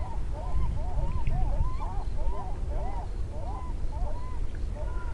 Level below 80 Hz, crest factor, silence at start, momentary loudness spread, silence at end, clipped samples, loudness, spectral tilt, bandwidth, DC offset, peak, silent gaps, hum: -30 dBFS; 14 dB; 0 s; 5 LU; 0 s; under 0.1%; -35 LUFS; -7.5 dB/octave; 6.2 kHz; under 0.1%; -14 dBFS; none; none